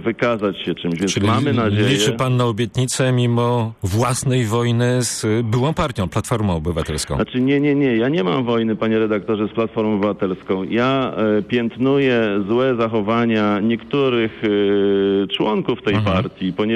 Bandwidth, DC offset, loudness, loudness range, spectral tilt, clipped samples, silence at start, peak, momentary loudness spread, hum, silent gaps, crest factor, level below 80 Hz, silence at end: 14 kHz; under 0.1%; -18 LUFS; 1 LU; -5.5 dB/octave; under 0.1%; 0 s; -8 dBFS; 5 LU; none; none; 10 dB; -44 dBFS; 0 s